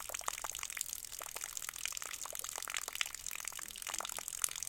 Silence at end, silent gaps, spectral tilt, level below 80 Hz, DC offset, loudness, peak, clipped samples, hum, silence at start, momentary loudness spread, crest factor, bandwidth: 0 s; none; 1.5 dB/octave; -66 dBFS; under 0.1%; -40 LUFS; -8 dBFS; under 0.1%; none; 0 s; 5 LU; 36 dB; 17 kHz